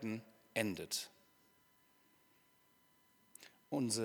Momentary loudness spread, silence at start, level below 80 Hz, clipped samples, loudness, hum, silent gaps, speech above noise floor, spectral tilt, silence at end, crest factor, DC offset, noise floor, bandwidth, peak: 20 LU; 0 s; -84 dBFS; under 0.1%; -42 LUFS; none; none; 33 dB; -3.5 dB/octave; 0 s; 24 dB; under 0.1%; -72 dBFS; 19 kHz; -20 dBFS